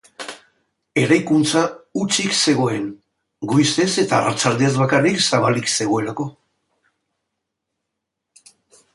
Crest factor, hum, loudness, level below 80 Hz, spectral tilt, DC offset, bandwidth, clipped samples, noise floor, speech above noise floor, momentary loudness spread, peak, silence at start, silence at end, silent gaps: 18 dB; none; -18 LUFS; -60 dBFS; -4 dB/octave; under 0.1%; 11.5 kHz; under 0.1%; -80 dBFS; 62 dB; 13 LU; -2 dBFS; 0.2 s; 2.65 s; none